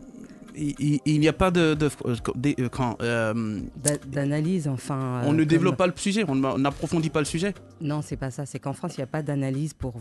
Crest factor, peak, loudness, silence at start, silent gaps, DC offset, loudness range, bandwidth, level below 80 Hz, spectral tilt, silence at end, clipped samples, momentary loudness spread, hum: 20 dB; -6 dBFS; -26 LUFS; 0 s; none; under 0.1%; 4 LU; 12.5 kHz; -46 dBFS; -6 dB/octave; 0 s; under 0.1%; 11 LU; none